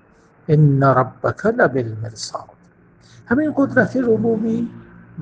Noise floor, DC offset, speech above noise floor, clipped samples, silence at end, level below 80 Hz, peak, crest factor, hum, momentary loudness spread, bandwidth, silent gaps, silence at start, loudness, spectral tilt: -51 dBFS; under 0.1%; 33 dB; under 0.1%; 0 s; -52 dBFS; 0 dBFS; 18 dB; none; 15 LU; 9.2 kHz; none; 0.5 s; -18 LUFS; -7.5 dB/octave